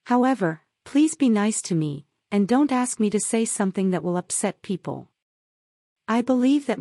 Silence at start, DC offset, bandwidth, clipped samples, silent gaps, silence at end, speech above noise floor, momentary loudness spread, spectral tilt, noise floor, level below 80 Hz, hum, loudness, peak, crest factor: 0.05 s; under 0.1%; 12 kHz; under 0.1%; 5.22-5.96 s; 0 s; over 68 dB; 11 LU; -5 dB/octave; under -90 dBFS; -70 dBFS; none; -23 LUFS; -8 dBFS; 16 dB